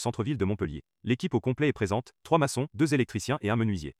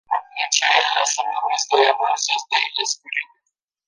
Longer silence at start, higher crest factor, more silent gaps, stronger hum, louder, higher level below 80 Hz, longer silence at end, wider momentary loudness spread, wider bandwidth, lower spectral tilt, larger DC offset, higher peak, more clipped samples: about the same, 0 s vs 0.1 s; about the same, 20 dB vs 20 dB; neither; neither; second, -29 LUFS vs -19 LUFS; first, -56 dBFS vs -80 dBFS; second, 0.1 s vs 0.65 s; second, 6 LU vs 9 LU; first, 14.5 kHz vs 10.5 kHz; first, -6 dB/octave vs 3.5 dB/octave; neither; second, -8 dBFS vs -2 dBFS; neither